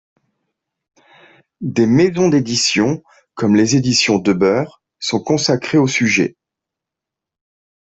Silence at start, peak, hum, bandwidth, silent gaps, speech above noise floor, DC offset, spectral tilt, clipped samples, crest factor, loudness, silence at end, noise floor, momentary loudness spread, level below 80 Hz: 1.6 s; -2 dBFS; none; 8.4 kHz; none; 69 dB; under 0.1%; -4.5 dB/octave; under 0.1%; 14 dB; -15 LUFS; 1.5 s; -84 dBFS; 9 LU; -54 dBFS